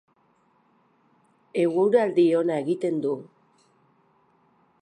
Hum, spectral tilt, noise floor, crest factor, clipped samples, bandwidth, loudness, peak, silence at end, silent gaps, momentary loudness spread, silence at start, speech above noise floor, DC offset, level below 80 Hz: none; -7.5 dB/octave; -65 dBFS; 18 dB; under 0.1%; 10 kHz; -23 LUFS; -8 dBFS; 1.55 s; none; 10 LU; 1.55 s; 42 dB; under 0.1%; -78 dBFS